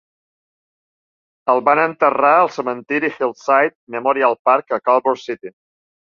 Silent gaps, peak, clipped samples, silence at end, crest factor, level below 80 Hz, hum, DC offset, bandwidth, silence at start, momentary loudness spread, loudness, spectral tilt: 3.75-3.87 s, 4.39-4.45 s; 0 dBFS; under 0.1%; 0.65 s; 18 dB; -68 dBFS; none; under 0.1%; 7.2 kHz; 1.45 s; 11 LU; -17 LUFS; -5.5 dB/octave